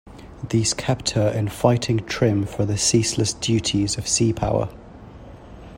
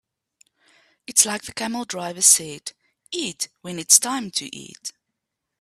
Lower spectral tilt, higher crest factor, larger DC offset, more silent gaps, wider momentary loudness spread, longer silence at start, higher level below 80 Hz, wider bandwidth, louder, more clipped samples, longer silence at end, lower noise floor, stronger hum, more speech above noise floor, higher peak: first, -4.5 dB/octave vs -0.5 dB/octave; about the same, 20 dB vs 24 dB; neither; neither; second, 5 LU vs 21 LU; second, 0.05 s vs 1.1 s; first, -44 dBFS vs -68 dBFS; about the same, 16.5 kHz vs 15.5 kHz; about the same, -21 LUFS vs -19 LUFS; neither; second, 0 s vs 0.7 s; second, -41 dBFS vs -81 dBFS; neither; second, 20 dB vs 58 dB; about the same, -2 dBFS vs 0 dBFS